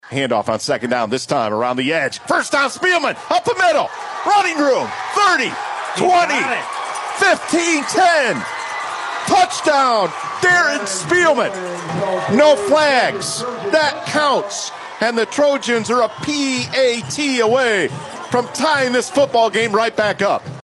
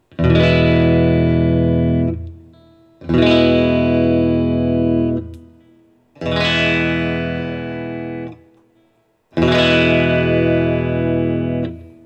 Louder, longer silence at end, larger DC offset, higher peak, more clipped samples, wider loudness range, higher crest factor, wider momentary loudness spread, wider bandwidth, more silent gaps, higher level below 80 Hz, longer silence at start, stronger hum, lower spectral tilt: about the same, -16 LUFS vs -16 LUFS; second, 0 s vs 0.2 s; neither; about the same, -2 dBFS vs 0 dBFS; neither; second, 2 LU vs 5 LU; about the same, 16 dB vs 16 dB; second, 9 LU vs 14 LU; first, 12 kHz vs 8.2 kHz; neither; second, -62 dBFS vs -38 dBFS; second, 0.05 s vs 0.2 s; neither; second, -3 dB/octave vs -7.5 dB/octave